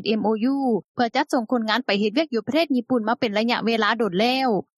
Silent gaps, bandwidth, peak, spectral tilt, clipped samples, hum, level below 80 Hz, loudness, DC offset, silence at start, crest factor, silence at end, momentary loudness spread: 0.84-0.95 s; 13 kHz; -6 dBFS; -5.5 dB/octave; under 0.1%; none; -72 dBFS; -22 LUFS; under 0.1%; 0 s; 16 dB; 0.15 s; 3 LU